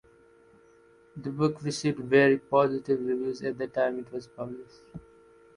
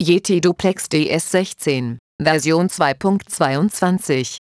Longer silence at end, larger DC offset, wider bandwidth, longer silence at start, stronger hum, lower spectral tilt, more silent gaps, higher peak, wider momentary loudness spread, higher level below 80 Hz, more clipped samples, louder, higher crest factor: first, 0.55 s vs 0.2 s; neither; about the same, 11 kHz vs 11 kHz; first, 1.15 s vs 0 s; neither; about the same, -6 dB/octave vs -5 dB/octave; second, none vs 1.99-2.19 s; second, -8 dBFS vs -2 dBFS; first, 25 LU vs 5 LU; second, -66 dBFS vs -54 dBFS; neither; second, -27 LUFS vs -18 LUFS; first, 22 dB vs 16 dB